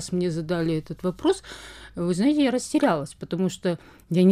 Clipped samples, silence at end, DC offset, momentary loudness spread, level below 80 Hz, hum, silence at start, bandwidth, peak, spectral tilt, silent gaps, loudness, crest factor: under 0.1%; 0 s; under 0.1%; 11 LU; -54 dBFS; none; 0 s; 13.5 kHz; -8 dBFS; -6 dB/octave; none; -25 LUFS; 16 dB